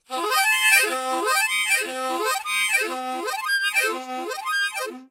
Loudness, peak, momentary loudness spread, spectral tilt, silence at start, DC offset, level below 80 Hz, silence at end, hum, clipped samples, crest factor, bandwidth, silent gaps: -21 LUFS; -4 dBFS; 11 LU; 2 dB/octave; 0.1 s; under 0.1%; -78 dBFS; 0.05 s; none; under 0.1%; 18 dB; 16 kHz; none